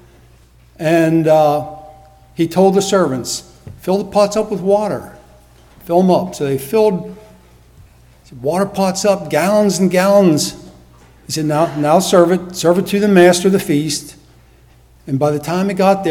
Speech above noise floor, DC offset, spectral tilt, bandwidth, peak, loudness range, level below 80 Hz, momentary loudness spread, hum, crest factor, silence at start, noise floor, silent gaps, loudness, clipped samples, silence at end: 33 dB; under 0.1%; -5.5 dB/octave; 17.5 kHz; 0 dBFS; 5 LU; -48 dBFS; 11 LU; none; 16 dB; 0.8 s; -47 dBFS; none; -14 LUFS; under 0.1%; 0 s